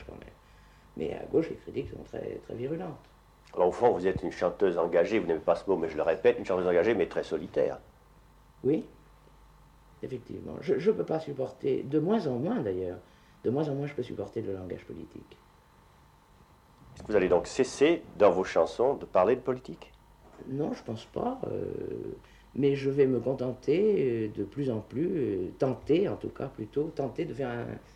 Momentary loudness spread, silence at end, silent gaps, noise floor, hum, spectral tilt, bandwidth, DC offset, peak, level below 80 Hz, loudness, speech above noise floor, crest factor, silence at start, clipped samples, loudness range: 15 LU; 0.15 s; none; -59 dBFS; none; -7 dB/octave; 10.5 kHz; under 0.1%; -10 dBFS; -58 dBFS; -30 LUFS; 30 dB; 20 dB; 0 s; under 0.1%; 9 LU